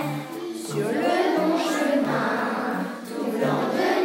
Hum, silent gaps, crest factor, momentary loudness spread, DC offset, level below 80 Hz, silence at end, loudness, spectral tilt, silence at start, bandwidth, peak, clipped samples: none; none; 16 dB; 9 LU; under 0.1%; -80 dBFS; 0 s; -24 LUFS; -5 dB/octave; 0 s; 16.5 kHz; -8 dBFS; under 0.1%